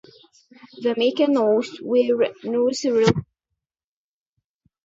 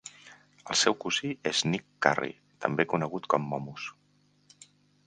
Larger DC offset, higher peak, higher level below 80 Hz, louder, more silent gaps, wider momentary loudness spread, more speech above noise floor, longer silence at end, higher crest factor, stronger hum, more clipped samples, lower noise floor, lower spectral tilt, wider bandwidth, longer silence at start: neither; about the same, -2 dBFS vs -2 dBFS; first, -56 dBFS vs -70 dBFS; first, -21 LUFS vs -29 LUFS; neither; second, 5 LU vs 14 LU; first, over 70 dB vs 37 dB; first, 1.6 s vs 1.15 s; second, 22 dB vs 28 dB; second, none vs 50 Hz at -55 dBFS; neither; first, under -90 dBFS vs -67 dBFS; first, -5.5 dB/octave vs -3.5 dB/octave; second, 8 kHz vs 10 kHz; first, 0.75 s vs 0.05 s